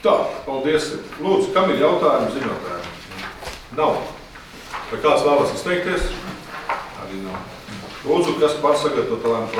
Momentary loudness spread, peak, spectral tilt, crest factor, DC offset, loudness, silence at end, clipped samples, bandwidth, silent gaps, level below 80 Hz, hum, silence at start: 16 LU; -4 dBFS; -5 dB/octave; 18 dB; under 0.1%; -21 LUFS; 0 s; under 0.1%; 16 kHz; none; -40 dBFS; none; 0 s